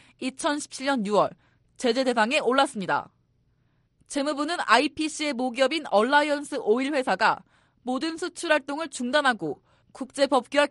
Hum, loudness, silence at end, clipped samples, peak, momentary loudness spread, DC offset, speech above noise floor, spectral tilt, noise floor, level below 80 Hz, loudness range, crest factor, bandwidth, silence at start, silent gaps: none; -25 LUFS; 0 s; under 0.1%; -6 dBFS; 11 LU; under 0.1%; 43 dB; -3 dB/octave; -67 dBFS; -68 dBFS; 3 LU; 20 dB; 11.5 kHz; 0.2 s; none